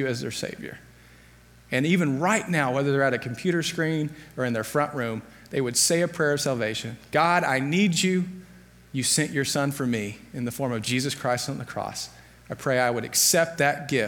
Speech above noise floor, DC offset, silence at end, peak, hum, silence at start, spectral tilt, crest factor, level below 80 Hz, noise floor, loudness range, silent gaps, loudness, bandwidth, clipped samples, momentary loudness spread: 27 dB; under 0.1%; 0 s; -6 dBFS; none; 0 s; -4 dB/octave; 18 dB; -60 dBFS; -52 dBFS; 3 LU; none; -25 LUFS; 19 kHz; under 0.1%; 12 LU